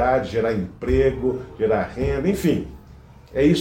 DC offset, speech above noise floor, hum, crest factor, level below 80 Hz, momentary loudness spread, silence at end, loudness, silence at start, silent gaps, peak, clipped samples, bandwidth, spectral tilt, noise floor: under 0.1%; 24 dB; none; 16 dB; -36 dBFS; 7 LU; 0 s; -22 LUFS; 0 s; none; -6 dBFS; under 0.1%; 16.5 kHz; -7 dB/octave; -45 dBFS